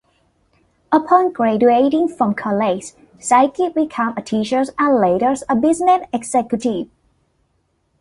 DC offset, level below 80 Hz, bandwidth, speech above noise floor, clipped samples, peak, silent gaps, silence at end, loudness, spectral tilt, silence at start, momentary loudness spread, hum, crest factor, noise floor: under 0.1%; -56 dBFS; 11.5 kHz; 49 dB; under 0.1%; -2 dBFS; none; 1.15 s; -17 LUFS; -5.5 dB/octave; 0.9 s; 8 LU; none; 16 dB; -65 dBFS